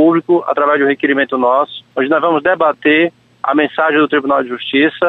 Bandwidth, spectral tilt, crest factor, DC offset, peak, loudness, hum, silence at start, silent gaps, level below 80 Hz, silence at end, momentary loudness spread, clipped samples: 4.1 kHz; -7.5 dB/octave; 12 dB; under 0.1%; -2 dBFS; -13 LUFS; none; 0 s; none; -60 dBFS; 0 s; 5 LU; under 0.1%